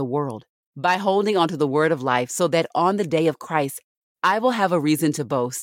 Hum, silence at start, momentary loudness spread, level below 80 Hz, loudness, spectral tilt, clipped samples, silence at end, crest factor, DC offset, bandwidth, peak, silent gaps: none; 0 s; 6 LU; -72 dBFS; -21 LUFS; -5 dB/octave; under 0.1%; 0 s; 18 dB; under 0.1%; 17 kHz; -4 dBFS; 0.49-0.73 s, 3.84-4.15 s